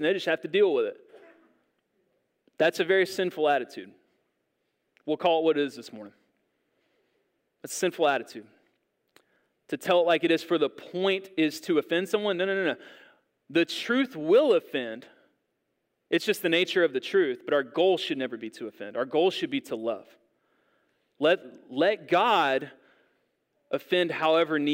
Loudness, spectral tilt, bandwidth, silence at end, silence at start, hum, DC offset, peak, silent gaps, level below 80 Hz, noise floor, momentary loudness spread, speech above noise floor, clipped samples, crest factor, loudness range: -26 LUFS; -4.5 dB/octave; 16 kHz; 0 s; 0 s; none; under 0.1%; -10 dBFS; none; -86 dBFS; -78 dBFS; 15 LU; 52 dB; under 0.1%; 18 dB; 5 LU